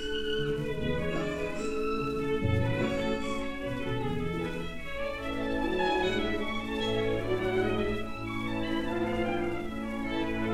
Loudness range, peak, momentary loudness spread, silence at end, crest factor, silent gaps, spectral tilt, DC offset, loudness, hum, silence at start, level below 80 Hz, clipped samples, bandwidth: 2 LU; -14 dBFS; 6 LU; 0 s; 16 dB; none; -6 dB/octave; under 0.1%; -32 LUFS; none; 0 s; -44 dBFS; under 0.1%; 15.5 kHz